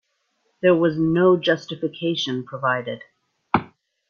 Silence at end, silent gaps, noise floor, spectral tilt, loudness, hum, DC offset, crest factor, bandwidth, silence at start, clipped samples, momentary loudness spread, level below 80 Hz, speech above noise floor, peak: 0.45 s; none; -70 dBFS; -6.5 dB/octave; -21 LUFS; none; under 0.1%; 20 dB; 7 kHz; 0.65 s; under 0.1%; 9 LU; -60 dBFS; 50 dB; -2 dBFS